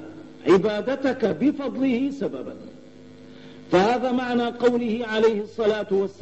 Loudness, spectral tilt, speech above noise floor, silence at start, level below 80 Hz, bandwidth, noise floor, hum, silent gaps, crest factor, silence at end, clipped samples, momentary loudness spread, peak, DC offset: -23 LUFS; -6.5 dB/octave; 23 dB; 0 s; -60 dBFS; 8.4 kHz; -46 dBFS; none; none; 16 dB; 0.1 s; under 0.1%; 10 LU; -8 dBFS; 0.2%